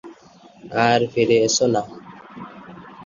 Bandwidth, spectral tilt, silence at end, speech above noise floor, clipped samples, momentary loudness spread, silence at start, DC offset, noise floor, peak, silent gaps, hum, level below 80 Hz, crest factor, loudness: 7.6 kHz; -4 dB/octave; 0 s; 30 dB; under 0.1%; 24 LU; 0.05 s; under 0.1%; -48 dBFS; -2 dBFS; none; none; -60 dBFS; 20 dB; -19 LUFS